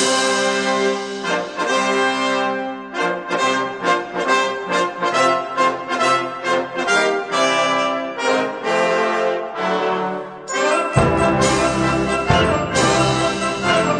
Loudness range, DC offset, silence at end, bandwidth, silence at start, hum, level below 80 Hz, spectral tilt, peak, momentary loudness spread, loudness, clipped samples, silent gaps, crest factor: 3 LU; under 0.1%; 0 s; 10.5 kHz; 0 s; none; -42 dBFS; -4 dB/octave; -2 dBFS; 6 LU; -18 LUFS; under 0.1%; none; 16 dB